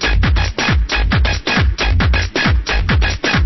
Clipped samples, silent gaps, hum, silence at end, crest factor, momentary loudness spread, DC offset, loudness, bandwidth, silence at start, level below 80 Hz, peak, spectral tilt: under 0.1%; none; none; 0 s; 12 dB; 1 LU; under 0.1%; -15 LUFS; 6.2 kHz; 0 s; -16 dBFS; -2 dBFS; -5 dB/octave